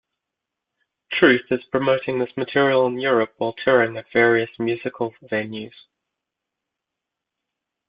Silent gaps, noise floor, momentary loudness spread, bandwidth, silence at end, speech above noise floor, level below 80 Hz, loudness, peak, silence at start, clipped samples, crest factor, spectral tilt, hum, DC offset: none; -84 dBFS; 11 LU; 5.2 kHz; 2.2 s; 63 dB; -62 dBFS; -20 LUFS; -2 dBFS; 1.1 s; under 0.1%; 22 dB; -9.5 dB/octave; none; under 0.1%